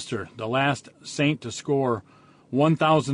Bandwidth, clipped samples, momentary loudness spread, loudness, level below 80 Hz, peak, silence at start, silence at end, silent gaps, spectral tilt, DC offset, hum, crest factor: 10.5 kHz; under 0.1%; 11 LU; -25 LUFS; -62 dBFS; -10 dBFS; 0 s; 0 s; none; -5.5 dB/octave; under 0.1%; none; 16 dB